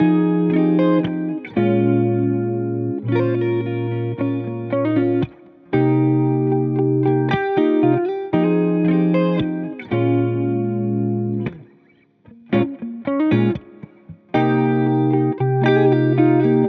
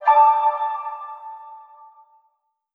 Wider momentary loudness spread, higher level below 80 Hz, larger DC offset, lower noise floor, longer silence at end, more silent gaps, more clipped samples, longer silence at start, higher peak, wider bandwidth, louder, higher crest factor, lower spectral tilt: second, 8 LU vs 25 LU; first, -58 dBFS vs under -90 dBFS; neither; second, -55 dBFS vs -69 dBFS; second, 0 s vs 1.15 s; neither; neither; about the same, 0 s vs 0 s; about the same, -4 dBFS vs -4 dBFS; first, 5 kHz vs 4.5 kHz; about the same, -19 LUFS vs -19 LUFS; about the same, 14 dB vs 18 dB; first, -10.5 dB/octave vs 0 dB/octave